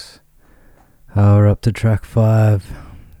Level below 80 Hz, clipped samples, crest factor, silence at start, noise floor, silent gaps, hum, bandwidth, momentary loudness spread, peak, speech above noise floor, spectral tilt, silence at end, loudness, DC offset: -38 dBFS; under 0.1%; 12 dB; 0 s; -49 dBFS; none; none; 9.6 kHz; 13 LU; -4 dBFS; 36 dB; -8.5 dB/octave; 0.25 s; -15 LUFS; under 0.1%